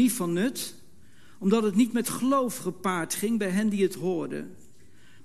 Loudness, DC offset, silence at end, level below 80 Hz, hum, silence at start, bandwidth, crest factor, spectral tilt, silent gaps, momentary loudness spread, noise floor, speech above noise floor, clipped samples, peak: -27 LUFS; 0.5%; 0.7 s; -68 dBFS; none; 0 s; 13 kHz; 16 dB; -5 dB/octave; none; 11 LU; -57 dBFS; 31 dB; under 0.1%; -10 dBFS